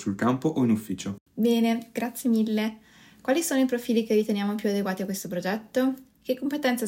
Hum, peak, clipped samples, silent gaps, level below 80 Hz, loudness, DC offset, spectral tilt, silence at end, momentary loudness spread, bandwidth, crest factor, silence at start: none; -12 dBFS; under 0.1%; 1.20-1.26 s; -70 dBFS; -26 LUFS; under 0.1%; -5 dB/octave; 0 s; 9 LU; 16.5 kHz; 14 dB; 0 s